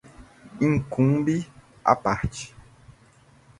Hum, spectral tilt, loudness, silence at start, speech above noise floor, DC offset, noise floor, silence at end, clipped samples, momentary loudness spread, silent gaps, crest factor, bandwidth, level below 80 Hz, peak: none; -7 dB/octave; -24 LUFS; 0.2 s; 33 dB; under 0.1%; -56 dBFS; 0.7 s; under 0.1%; 16 LU; none; 24 dB; 11.5 kHz; -46 dBFS; -2 dBFS